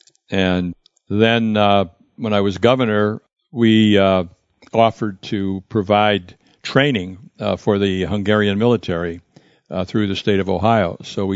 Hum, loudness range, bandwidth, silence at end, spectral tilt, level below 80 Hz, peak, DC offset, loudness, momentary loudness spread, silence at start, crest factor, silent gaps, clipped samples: none; 3 LU; 7.8 kHz; 0 s; -7 dB/octave; -52 dBFS; 0 dBFS; under 0.1%; -18 LUFS; 12 LU; 0.3 s; 18 dB; none; under 0.1%